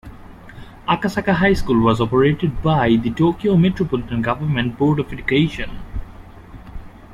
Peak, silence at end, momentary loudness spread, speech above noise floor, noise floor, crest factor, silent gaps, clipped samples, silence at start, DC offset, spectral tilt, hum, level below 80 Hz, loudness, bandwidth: -2 dBFS; 0 s; 15 LU; 21 dB; -39 dBFS; 16 dB; none; under 0.1%; 0.05 s; under 0.1%; -7.5 dB/octave; none; -36 dBFS; -18 LUFS; 12.5 kHz